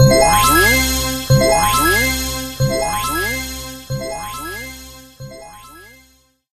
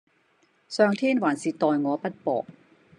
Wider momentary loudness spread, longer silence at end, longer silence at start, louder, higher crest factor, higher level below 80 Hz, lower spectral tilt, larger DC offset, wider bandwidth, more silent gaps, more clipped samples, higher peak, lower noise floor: first, 23 LU vs 9 LU; first, 0.7 s vs 0.45 s; second, 0 s vs 0.7 s; first, -15 LUFS vs -25 LUFS; about the same, 18 dB vs 20 dB; first, -30 dBFS vs -78 dBFS; second, -3.5 dB/octave vs -5.5 dB/octave; neither; first, 14.5 kHz vs 10.5 kHz; neither; neither; first, 0 dBFS vs -6 dBFS; second, -54 dBFS vs -65 dBFS